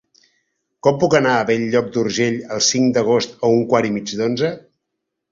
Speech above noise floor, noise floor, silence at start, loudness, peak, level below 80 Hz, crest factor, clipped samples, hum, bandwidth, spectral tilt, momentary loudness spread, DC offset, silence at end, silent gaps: 61 dB; -78 dBFS; 0.85 s; -18 LUFS; 0 dBFS; -56 dBFS; 18 dB; under 0.1%; none; 7.8 kHz; -4 dB/octave; 7 LU; under 0.1%; 0.75 s; none